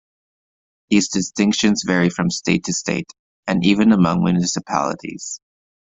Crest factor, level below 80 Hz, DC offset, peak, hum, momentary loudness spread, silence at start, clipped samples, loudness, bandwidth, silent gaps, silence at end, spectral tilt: 18 dB; -52 dBFS; under 0.1%; -2 dBFS; none; 14 LU; 0.9 s; under 0.1%; -18 LUFS; 8 kHz; 3.19-3.43 s; 0.5 s; -4.5 dB/octave